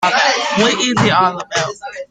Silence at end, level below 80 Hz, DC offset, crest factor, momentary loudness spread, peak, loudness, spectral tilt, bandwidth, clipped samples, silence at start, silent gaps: 0.05 s; -52 dBFS; under 0.1%; 14 dB; 8 LU; -2 dBFS; -14 LUFS; -3.5 dB/octave; 10 kHz; under 0.1%; 0 s; none